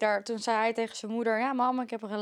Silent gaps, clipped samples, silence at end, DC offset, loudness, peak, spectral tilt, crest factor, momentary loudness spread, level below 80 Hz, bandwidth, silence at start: none; under 0.1%; 0 s; under 0.1%; -30 LUFS; -14 dBFS; -4 dB/octave; 16 dB; 6 LU; -88 dBFS; 12 kHz; 0 s